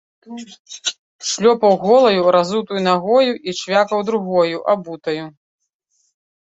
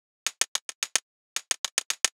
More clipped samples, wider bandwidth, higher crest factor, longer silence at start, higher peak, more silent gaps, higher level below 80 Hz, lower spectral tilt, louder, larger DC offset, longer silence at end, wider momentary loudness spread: neither; second, 8.2 kHz vs over 20 kHz; second, 16 dB vs 28 dB; about the same, 0.3 s vs 0.25 s; about the same, -2 dBFS vs -4 dBFS; second, 0.59-0.65 s, 0.99-1.19 s vs 0.48-0.55 s, 0.62-0.69 s, 0.75-0.82 s, 1.02-1.36 s, 1.58-1.64 s, 1.72-1.77 s, 1.85-1.90 s; first, -64 dBFS vs under -90 dBFS; first, -4 dB/octave vs 4 dB/octave; first, -17 LUFS vs -29 LUFS; neither; first, 1.25 s vs 0.05 s; first, 20 LU vs 8 LU